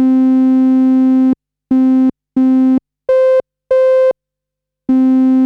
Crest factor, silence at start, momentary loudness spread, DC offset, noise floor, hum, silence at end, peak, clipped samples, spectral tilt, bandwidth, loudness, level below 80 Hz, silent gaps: 8 dB; 0 s; 6 LU; under 0.1%; -80 dBFS; 50 Hz at -60 dBFS; 0 s; -4 dBFS; under 0.1%; -8 dB/octave; 4.1 kHz; -12 LUFS; -56 dBFS; none